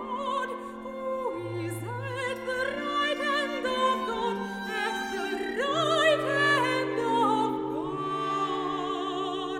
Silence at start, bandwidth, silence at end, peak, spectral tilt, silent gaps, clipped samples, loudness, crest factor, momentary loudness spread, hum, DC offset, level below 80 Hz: 0 s; 16 kHz; 0 s; -12 dBFS; -4.5 dB/octave; none; under 0.1%; -28 LUFS; 18 dB; 10 LU; none; under 0.1%; -62 dBFS